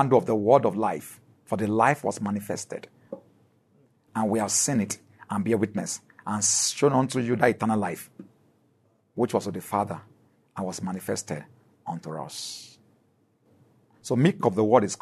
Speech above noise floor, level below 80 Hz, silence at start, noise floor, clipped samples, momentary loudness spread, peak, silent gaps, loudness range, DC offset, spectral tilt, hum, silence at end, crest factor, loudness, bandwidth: 41 dB; -70 dBFS; 0 s; -66 dBFS; under 0.1%; 18 LU; -4 dBFS; none; 10 LU; under 0.1%; -4.5 dB/octave; none; 0.05 s; 22 dB; -26 LUFS; 13.5 kHz